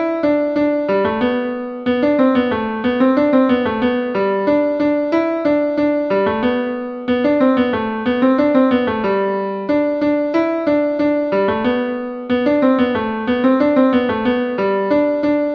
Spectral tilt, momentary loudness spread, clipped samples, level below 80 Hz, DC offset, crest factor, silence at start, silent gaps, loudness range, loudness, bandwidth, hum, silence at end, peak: -8 dB/octave; 6 LU; under 0.1%; -50 dBFS; under 0.1%; 16 dB; 0 s; none; 1 LU; -17 LUFS; 5.8 kHz; none; 0 s; 0 dBFS